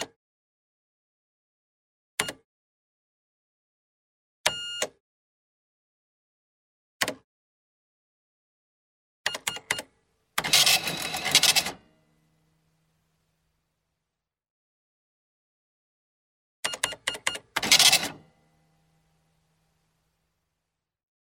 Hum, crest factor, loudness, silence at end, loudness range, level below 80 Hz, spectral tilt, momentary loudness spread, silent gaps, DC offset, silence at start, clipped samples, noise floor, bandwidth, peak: none; 30 dB; -24 LUFS; 3.05 s; 16 LU; -68 dBFS; 0.5 dB/octave; 15 LU; 0.16-2.18 s, 2.44-4.44 s, 5.00-7.00 s, 7.24-9.24 s, 14.50-16.63 s; under 0.1%; 0 s; under 0.1%; -86 dBFS; 16.5 kHz; -2 dBFS